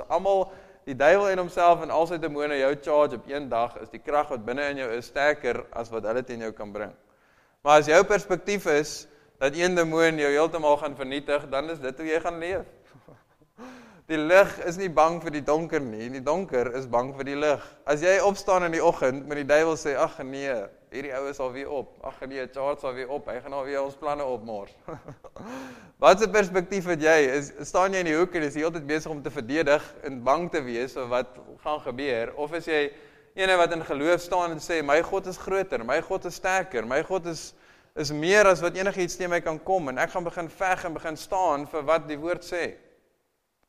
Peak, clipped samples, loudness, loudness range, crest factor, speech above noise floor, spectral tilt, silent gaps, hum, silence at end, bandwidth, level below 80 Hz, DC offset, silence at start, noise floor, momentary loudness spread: -2 dBFS; under 0.1%; -25 LUFS; 7 LU; 24 dB; 49 dB; -4.5 dB/octave; none; none; 0.9 s; 15 kHz; -52 dBFS; under 0.1%; 0 s; -74 dBFS; 14 LU